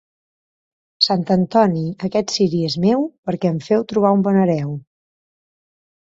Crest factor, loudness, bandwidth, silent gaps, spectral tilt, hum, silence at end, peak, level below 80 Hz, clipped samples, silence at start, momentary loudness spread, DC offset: 18 dB; -18 LUFS; 7.8 kHz; 3.18-3.23 s; -6.5 dB/octave; none; 1.3 s; 0 dBFS; -58 dBFS; under 0.1%; 1 s; 8 LU; under 0.1%